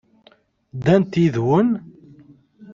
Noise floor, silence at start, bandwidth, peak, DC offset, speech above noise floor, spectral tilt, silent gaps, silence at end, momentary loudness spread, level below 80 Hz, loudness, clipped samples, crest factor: -56 dBFS; 0.75 s; 7.4 kHz; -2 dBFS; under 0.1%; 38 dB; -8.5 dB/octave; none; 0 s; 10 LU; -56 dBFS; -19 LUFS; under 0.1%; 18 dB